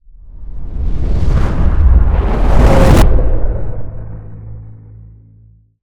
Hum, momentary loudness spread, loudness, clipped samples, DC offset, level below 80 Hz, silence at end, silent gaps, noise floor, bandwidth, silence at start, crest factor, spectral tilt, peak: none; 22 LU; -14 LUFS; under 0.1%; under 0.1%; -14 dBFS; 1.1 s; none; -44 dBFS; 15 kHz; 0.25 s; 12 dB; -7.5 dB/octave; 0 dBFS